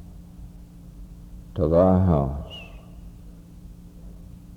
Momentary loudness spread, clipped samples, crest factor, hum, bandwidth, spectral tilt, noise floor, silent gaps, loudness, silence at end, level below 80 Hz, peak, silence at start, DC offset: 27 LU; under 0.1%; 20 dB; none; 6.8 kHz; -9.5 dB/octave; -44 dBFS; none; -21 LUFS; 0 s; -40 dBFS; -6 dBFS; 0 s; under 0.1%